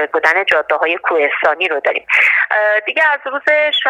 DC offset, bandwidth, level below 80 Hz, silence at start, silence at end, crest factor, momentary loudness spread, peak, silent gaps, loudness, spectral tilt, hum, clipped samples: under 0.1%; 12.5 kHz; -64 dBFS; 0 s; 0 s; 14 dB; 4 LU; 0 dBFS; none; -13 LUFS; -1.5 dB/octave; none; under 0.1%